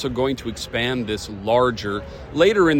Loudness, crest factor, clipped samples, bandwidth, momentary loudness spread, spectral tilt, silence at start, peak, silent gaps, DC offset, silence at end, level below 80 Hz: -22 LUFS; 18 dB; under 0.1%; 16.5 kHz; 10 LU; -5.5 dB/octave; 0 s; -4 dBFS; none; under 0.1%; 0 s; -42 dBFS